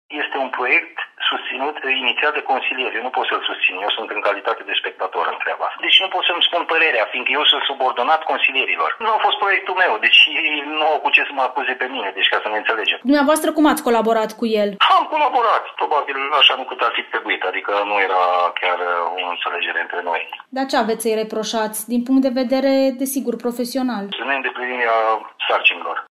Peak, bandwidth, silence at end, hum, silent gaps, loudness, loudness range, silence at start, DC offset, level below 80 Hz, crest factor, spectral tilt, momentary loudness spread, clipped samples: 0 dBFS; 15.5 kHz; 0.05 s; none; none; -18 LUFS; 5 LU; 0.1 s; under 0.1%; -66 dBFS; 18 dB; -2 dB/octave; 8 LU; under 0.1%